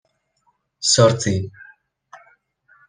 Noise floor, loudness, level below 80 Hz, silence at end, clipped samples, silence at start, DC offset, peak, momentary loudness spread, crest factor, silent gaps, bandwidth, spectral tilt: -67 dBFS; -17 LUFS; -58 dBFS; 0.75 s; under 0.1%; 0.8 s; under 0.1%; -2 dBFS; 13 LU; 20 dB; none; 10.5 kHz; -4 dB/octave